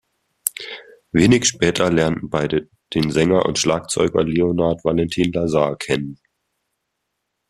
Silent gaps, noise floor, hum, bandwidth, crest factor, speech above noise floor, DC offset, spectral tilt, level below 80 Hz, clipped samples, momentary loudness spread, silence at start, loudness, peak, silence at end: none; -76 dBFS; none; 14 kHz; 20 dB; 58 dB; under 0.1%; -4.5 dB/octave; -46 dBFS; under 0.1%; 10 LU; 0.45 s; -19 LUFS; 0 dBFS; 1.35 s